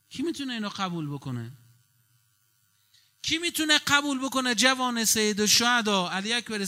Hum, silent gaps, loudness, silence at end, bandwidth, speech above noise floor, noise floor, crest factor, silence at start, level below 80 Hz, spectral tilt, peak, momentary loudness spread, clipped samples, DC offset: none; none; -24 LUFS; 0 s; 16 kHz; 42 dB; -68 dBFS; 22 dB; 0.1 s; -66 dBFS; -2 dB/octave; -6 dBFS; 14 LU; under 0.1%; under 0.1%